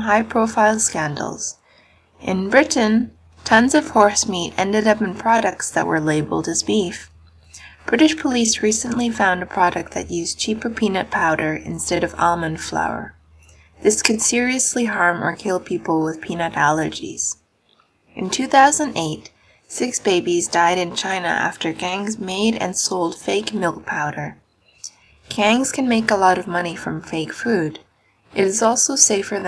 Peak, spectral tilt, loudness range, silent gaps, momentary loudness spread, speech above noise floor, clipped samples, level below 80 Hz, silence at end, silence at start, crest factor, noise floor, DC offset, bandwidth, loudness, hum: 0 dBFS; -3 dB/octave; 4 LU; none; 11 LU; 41 dB; under 0.1%; -52 dBFS; 0 s; 0 s; 20 dB; -60 dBFS; under 0.1%; 11 kHz; -19 LUFS; none